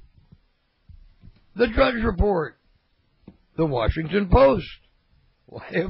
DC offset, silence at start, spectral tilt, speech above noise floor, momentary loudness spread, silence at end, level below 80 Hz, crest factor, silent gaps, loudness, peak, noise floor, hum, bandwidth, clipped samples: under 0.1%; 0.9 s; -11 dB/octave; 45 dB; 22 LU; 0 s; -34 dBFS; 18 dB; none; -22 LUFS; -6 dBFS; -66 dBFS; none; 5.8 kHz; under 0.1%